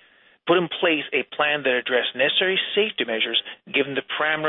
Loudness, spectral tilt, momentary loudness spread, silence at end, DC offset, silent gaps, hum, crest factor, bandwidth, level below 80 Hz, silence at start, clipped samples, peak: -22 LUFS; -8.5 dB/octave; 5 LU; 0 s; under 0.1%; none; none; 16 dB; 4.1 kHz; -70 dBFS; 0.45 s; under 0.1%; -6 dBFS